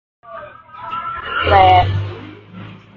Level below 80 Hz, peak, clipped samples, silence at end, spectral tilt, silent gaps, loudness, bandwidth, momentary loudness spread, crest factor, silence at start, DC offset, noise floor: -32 dBFS; 0 dBFS; under 0.1%; 0.2 s; -7.5 dB/octave; none; -14 LUFS; 6.2 kHz; 26 LU; 18 dB; 0.3 s; under 0.1%; -36 dBFS